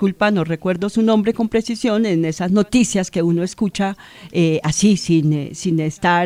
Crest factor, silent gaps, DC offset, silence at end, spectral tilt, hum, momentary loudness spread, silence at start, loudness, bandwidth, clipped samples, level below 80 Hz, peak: 14 dB; none; under 0.1%; 0 s; -5.5 dB/octave; none; 5 LU; 0 s; -18 LUFS; 15 kHz; under 0.1%; -48 dBFS; -2 dBFS